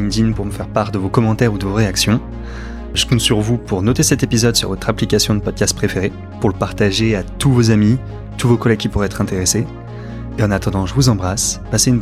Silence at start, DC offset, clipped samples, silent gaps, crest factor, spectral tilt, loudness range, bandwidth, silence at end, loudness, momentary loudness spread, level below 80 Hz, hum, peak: 0 s; 0.2%; under 0.1%; none; 16 dB; -4.5 dB/octave; 2 LU; 15.5 kHz; 0 s; -16 LUFS; 8 LU; -30 dBFS; none; 0 dBFS